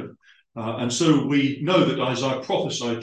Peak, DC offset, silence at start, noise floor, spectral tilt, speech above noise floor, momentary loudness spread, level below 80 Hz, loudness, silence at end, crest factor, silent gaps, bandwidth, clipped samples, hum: -6 dBFS; under 0.1%; 0 s; -48 dBFS; -5 dB/octave; 26 dB; 12 LU; -66 dBFS; -22 LUFS; 0 s; 18 dB; none; 10 kHz; under 0.1%; none